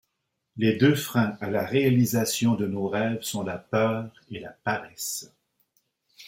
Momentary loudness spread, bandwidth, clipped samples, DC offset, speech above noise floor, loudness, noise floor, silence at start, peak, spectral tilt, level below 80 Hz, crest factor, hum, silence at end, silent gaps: 12 LU; 16.5 kHz; under 0.1%; under 0.1%; 54 dB; -26 LUFS; -79 dBFS; 0.55 s; -8 dBFS; -5.5 dB/octave; -66 dBFS; 20 dB; none; 0 s; none